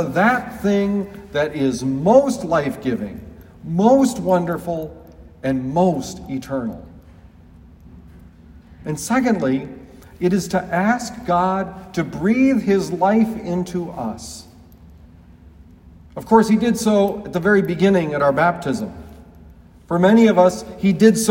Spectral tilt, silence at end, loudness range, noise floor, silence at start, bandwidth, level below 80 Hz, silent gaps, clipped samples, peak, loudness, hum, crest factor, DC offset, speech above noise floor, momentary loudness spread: -6 dB/octave; 0 s; 8 LU; -45 dBFS; 0 s; 16.5 kHz; -48 dBFS; none; under 0.1%; 0 dBFS; -18 LUFS; none; 18 dB; under 0.1%; 27 dB; 14 LU